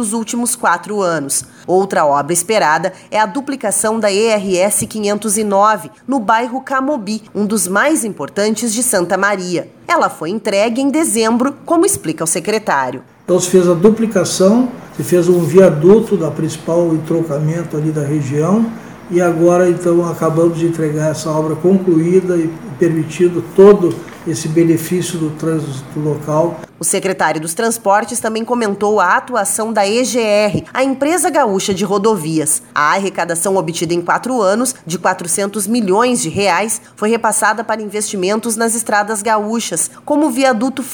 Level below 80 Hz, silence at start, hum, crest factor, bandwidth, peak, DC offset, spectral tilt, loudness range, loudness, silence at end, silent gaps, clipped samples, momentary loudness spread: -54 dBFS; 0 s; none; 14 dB; over 20 kHz; 0 dBFS; under 0.1%; -4.5 dB/octave; 3 LU; -14 LUFS; 0 s; none; under 0.1%; 7 LU